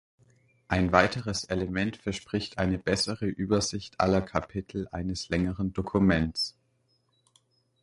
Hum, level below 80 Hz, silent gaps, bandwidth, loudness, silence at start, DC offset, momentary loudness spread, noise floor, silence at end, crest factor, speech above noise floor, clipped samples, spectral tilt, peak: none; -46 dBFS; none; 11.5 kHz; -28 LUFS; 0.7 s; under 0.1%; 10 LU; -71 dBFS; 1.35 s; 26 dB; 43 dB; under 0.1%; -5 dB/octave; -4 dBFS